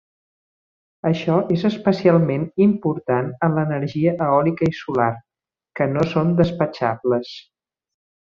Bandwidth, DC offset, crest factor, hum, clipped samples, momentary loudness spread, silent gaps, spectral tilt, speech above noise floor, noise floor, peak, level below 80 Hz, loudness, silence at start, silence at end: 7 kHz; under 0.1%; 18 dB; none; under 0.1%; 6 LU; none; -8.5 dB/octave; 23 dB; -42 dBFS; -2 dBFS; -54 dBFS; -20 LUFS; 1.05 s; 0.9 s